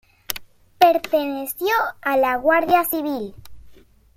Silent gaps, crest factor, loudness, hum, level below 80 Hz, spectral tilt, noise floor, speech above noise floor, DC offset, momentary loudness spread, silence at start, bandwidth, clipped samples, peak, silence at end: none; 20 dB; -20 LUFS; none; -54 dBFS; -3 dB/octave; -48 dBFS; 28 dB; under 0.1%; 14 LU; 0.3 s; 16.5 kHz; under 0.1%; -2 dBFS; 0.45 s